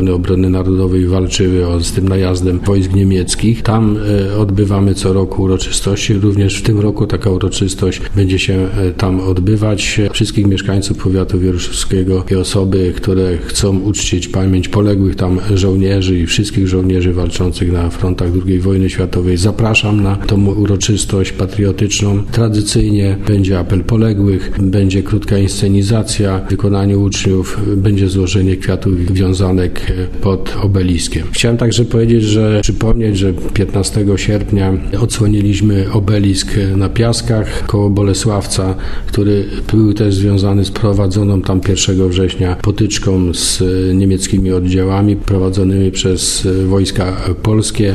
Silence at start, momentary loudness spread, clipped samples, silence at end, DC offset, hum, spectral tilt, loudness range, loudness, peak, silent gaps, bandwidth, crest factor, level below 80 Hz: 0 s; 3 LU; under 0.1%; 0 s; 0.3%; none; -6 dB/octave; 1 LU; -13 LUFS; 0 dBFS; none; 13 kHz; 12 dB; -24 dBFS